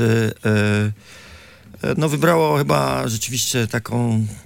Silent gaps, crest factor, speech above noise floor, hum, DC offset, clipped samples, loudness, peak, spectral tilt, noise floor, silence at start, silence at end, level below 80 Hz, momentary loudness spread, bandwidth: none; 16 dB; 24 dB; none; under 0.1%; under 0.1%; -19 LUFS; -4 dBFS; -5 dB/octave; -43 dBFS; 0 s; 0.05 s; -50 dBFS; 7 LU; 17 kHz